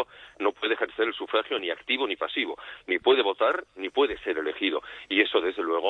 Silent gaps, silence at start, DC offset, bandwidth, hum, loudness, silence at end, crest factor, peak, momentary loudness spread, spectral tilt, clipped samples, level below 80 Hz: none; 0 s; under 0.1%; 6.2 kHz; none; -27 LUFS; 0 s; 20 dB; -6 dBFS; 8 LU; -4 dB/octave; under 0.1%; -64 dBFS